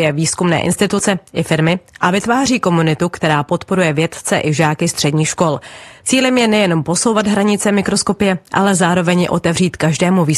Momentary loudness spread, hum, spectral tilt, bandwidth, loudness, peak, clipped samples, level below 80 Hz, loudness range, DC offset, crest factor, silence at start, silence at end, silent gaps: 4 LU; none; -4.5 dB/octave; 12.5 kHz; -15 LUFS; 0 dBFS; under 0.1%; -48 dBFS; 2 LU; under 0.1%; 14 dB; 0 s; 0 s; none